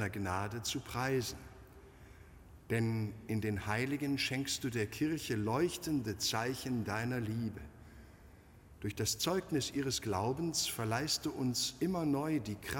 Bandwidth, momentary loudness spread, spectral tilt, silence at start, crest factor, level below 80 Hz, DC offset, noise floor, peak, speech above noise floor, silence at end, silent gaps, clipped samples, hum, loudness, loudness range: 17 kHz; 6 LU; -4.5 dB/octave; 0 s; 18 dB; -60 dBFS; under 0.1%; -58 dBFS; -20 dBFS; 22 dB; 0 s; none; under 0.1%; none; -36 LUFS; 4 LU